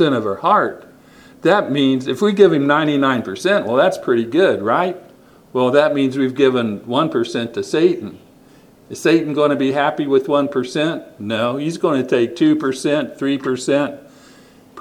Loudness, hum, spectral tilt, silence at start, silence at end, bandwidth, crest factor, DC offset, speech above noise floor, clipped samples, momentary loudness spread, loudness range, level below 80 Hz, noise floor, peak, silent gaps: -17 LUFS; none; -5.5 dB/octave; 0 s; 0 s; 15 kHz; 18 dB; under 0.1%; 31 dB; under 0.1%; 7 LU; 3 LU; -62 dBFS; -47 dBFS; 0 dBFS; none